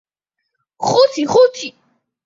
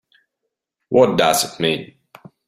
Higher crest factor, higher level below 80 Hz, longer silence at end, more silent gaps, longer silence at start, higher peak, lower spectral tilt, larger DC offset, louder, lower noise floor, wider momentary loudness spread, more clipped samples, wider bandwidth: about the same, 16 dB vs 20 dB; about the same, -60 dBFS vs -58 dBFS; about the same, 0.55 s vs 0.65 s; neither; about the same, 0.8 s vs 0.9 s; about the same, -2 dBFS vs -2 dBFS; about the same, -4 dB/octave vs -3.5 dB/octave; neither; first, -14 LUFS vs -17 LUFS; about the same, -77 dBFS vs -79 dBFS; first, 15 LU vs 7 LU; neither; second, 7.8 kHz vs 16 kHz